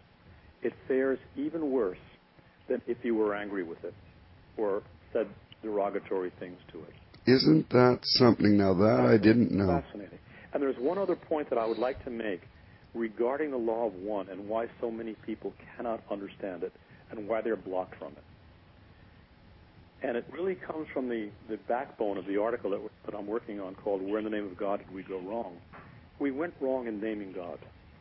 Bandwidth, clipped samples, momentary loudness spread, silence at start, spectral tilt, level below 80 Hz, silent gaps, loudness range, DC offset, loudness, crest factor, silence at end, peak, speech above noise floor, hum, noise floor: 5.8 kHz; under 0.1%; 19 LU; 0.3 s; -9.5 dB/octave; -58 dBFS; none; 13 LU; under 0.1%; -31 LUFS; 24 dB; 0.3 s; -8 dBFS; 29 dB; none; -59 dBFS